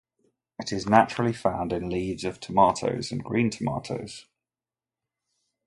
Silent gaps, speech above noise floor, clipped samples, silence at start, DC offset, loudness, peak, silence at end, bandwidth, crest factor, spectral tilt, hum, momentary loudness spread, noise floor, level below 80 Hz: none; over 65 dB; under 0.1%; 0.6 s; under 0.1%; -26 LUFS; -4 dBFS; 1.45 s; 11.5 kHz; 24 dB; -5.5 dB/octave; none; 14 LU; under -90 dBFS; -54 dBFS